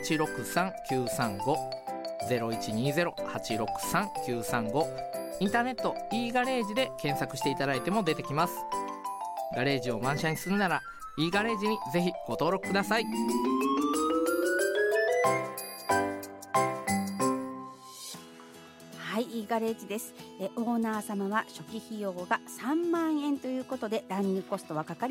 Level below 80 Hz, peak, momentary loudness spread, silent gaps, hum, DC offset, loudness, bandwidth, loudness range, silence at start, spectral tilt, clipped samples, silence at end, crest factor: -62 dBFS; -12 dBFS; 10 LU; none; none; under 0.1%; -31 LUFS; 16.5 kHz; 5 LU; 0 s; -4.5 dB/octave; under 0.1%; 0 s; 18 dB